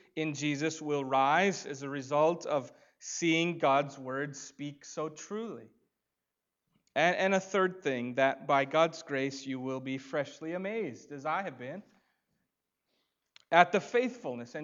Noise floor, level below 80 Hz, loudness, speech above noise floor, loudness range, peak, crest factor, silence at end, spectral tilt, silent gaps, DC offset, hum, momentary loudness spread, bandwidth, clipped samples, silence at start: -88 dBFS; -86 dBFS; -31 LUFS; 56 dB; 8 LU; -6 dBFS; 26 dB; 0 s; -4.5 dB/octave; none; under 0.1%; none; 14 LU; 7.8 kHz; under 0.1%; 0.15 s